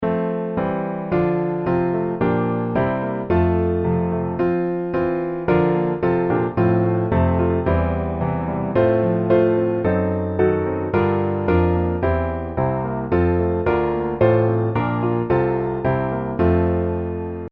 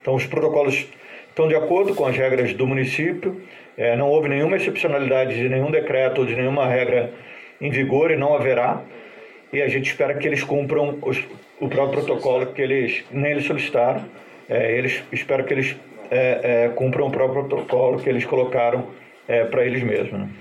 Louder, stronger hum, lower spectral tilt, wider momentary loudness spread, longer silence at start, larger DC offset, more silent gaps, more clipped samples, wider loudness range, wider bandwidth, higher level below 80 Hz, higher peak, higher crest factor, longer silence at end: about the same, -20 LUFS vs -21 LUFS; neither; first, -11.5 dB/octave vs -7 dB/octave; second, 5 LU vs 10 LU; about the same, 0 s vs 0.05 s; neither; neither; neither; about the same, 2 LU vs 2 LU; second, 4.6 kHz vs 12.5 kHz; first, -36 dBFS vs -62 dBFS; about the same, -4 dBFS vs -6 dBFS; about the same, 16 dB vs 16 dB; about the same, 0.05 s vs 0 s